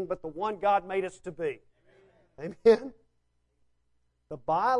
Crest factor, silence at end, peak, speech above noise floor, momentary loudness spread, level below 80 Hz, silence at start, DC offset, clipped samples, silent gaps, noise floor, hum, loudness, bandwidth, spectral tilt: 22 dB; 0 s; -8 dBFS; 45 dB; 20 LU; -64 dBFS; 0 s; under 0.1%; under 0.1%; none; -73 dBFS; none; -28 LUFS; 11 kHz; -6 dB/octave